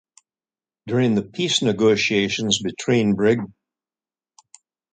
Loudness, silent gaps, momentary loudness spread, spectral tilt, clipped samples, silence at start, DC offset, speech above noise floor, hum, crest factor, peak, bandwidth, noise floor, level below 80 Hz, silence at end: -20 LUFS; none; 5 LU; -4.5 dB/octave; under 0.1%; 0.85 s; under 0.1%; over 70 dB; none; 20 dB; -2 dBFS; 9.4 kHz; under -90 dBFS; -58 dBFS; 1.45 s